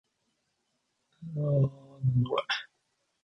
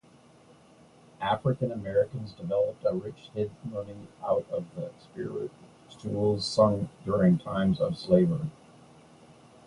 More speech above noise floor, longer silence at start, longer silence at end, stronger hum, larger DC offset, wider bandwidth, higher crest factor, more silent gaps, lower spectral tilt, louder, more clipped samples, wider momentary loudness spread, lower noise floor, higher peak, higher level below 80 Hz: first, 51 dB vs 29 dB; about the same, 1.2 s vs 1.2 s; second, 0.6 s vs 1.15 s; neither; neither; second, 6.2 kHz vs 11 kHz; about the same, 16 dB vs 20 dB; neither; about the same, -7 dB/octave vs -7.5 dB/octave; about the same, -30 LUFS vs -29 LUFS; neither; second, 9 LU vs 15 LU; first, -78 dBFS vs -57 dBFS; second, -16 dBFS vs -8 dBFS; second, -62 dBFS vs -56 dBFS